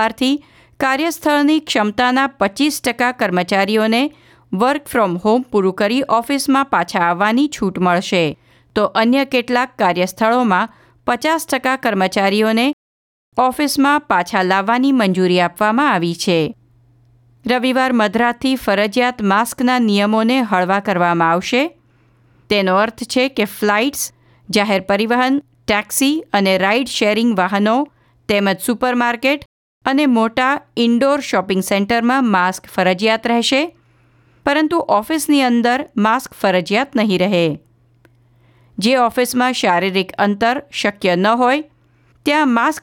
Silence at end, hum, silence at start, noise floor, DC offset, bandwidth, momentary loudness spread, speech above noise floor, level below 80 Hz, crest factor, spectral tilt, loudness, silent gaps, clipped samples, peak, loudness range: 0.05 s; none; 0 s; -54 dBFS; under 0.1%; 19 kHz; 5 LU; 38 dB; -54 dBFS; 14 dB; -4.5 dB/octave; -16 LUFS; 12.73-13.32 s, 29.46-29.81 s; under 0.1%; -2 dBFS; 2 LU